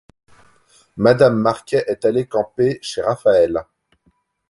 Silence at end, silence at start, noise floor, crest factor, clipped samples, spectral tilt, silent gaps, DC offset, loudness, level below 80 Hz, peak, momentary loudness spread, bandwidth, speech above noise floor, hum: 0.9 s; 0.95 s; -63 dBFS; 18 dB; under 0.1%; -6.5 dB/octave; none; under 0.1%; -17 LUFS; -52 dBFS; 0 dBFS; 9 LU; 11.5 kHz; 46 dB; none